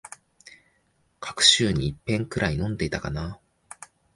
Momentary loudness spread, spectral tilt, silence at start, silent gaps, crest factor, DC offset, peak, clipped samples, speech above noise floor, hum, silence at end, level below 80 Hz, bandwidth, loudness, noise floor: 27 LU; -3.5 dB/octave; 0.05 s; none; 24 dB; under 0.1%; -4 dBFS; under 0.1%; 43 dB; none; 0.3 s; -44 dBFS; 11.5 kHz; -23 LUFS; -68 dBFS